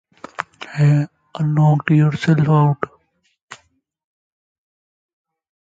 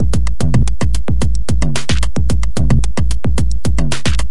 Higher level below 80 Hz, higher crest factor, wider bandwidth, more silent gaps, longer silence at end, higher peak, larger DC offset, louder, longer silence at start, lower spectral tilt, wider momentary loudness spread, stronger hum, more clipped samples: second, -58 dBFS vs -18 dBFS; first, 18 dB vs 12 dB; second, 7.8 kHz vs 11.5 kHz; first, 3.42-3.48 s vs none; first, 2.2 s vs 0 s; about the same, 0 dBFS vs 0 dBFS; second, under 0.1% vs 30%; about the same, -17 LUFS vs -17 LUFS; first, 0.4 s vs 0 s; first, -8.5 dB/octave vs -5.5 dB/octave; first, 15 LU vs 3 LU; neither; neither